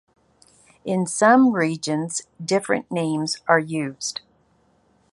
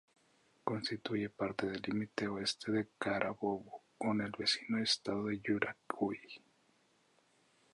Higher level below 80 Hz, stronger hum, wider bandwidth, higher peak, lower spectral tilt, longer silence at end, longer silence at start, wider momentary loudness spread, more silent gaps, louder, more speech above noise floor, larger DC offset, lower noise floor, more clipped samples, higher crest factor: about the same, -68 dBFS vs -72 dBFS; neither; about the same, 11.5 kHz vs 11.5 kHz; first, -2 dBFS vs -16 dBFS; about the same, -4.5 dB/octave vs -4.5 dB/octave; second, 1 s vs 1.35 s; first, 0.85 s vs 0.65 s; first, 13 LU vs 7 LU; neither; first, -21 LUFS vs -37 LUFS; first, 41 dB vs 35 dB; neither; second, -62 dBFS vs -73 dBFS; neither; about the same, 20 dB vs 22 dB